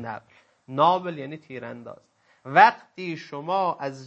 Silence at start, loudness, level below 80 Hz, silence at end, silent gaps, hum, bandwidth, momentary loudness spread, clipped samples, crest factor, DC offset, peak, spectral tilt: 0 s; -22 LUFS; -78 dBFS; 0 s; none; none; 7.8 kHz; 21 LU; under 0.1%; 24 dB; under 0.1%; 0 dBFS; -6 dB/octave